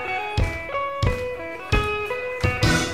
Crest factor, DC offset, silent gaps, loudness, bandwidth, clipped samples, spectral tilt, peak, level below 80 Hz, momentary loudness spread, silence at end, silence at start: 18 dB; 0.4%; none; -24 LUFS; 15.5 kHz; under 0.1%; -5 dB/octave; -6 dBFS; -32 dBFS; 7 LU; 0 s; 0 s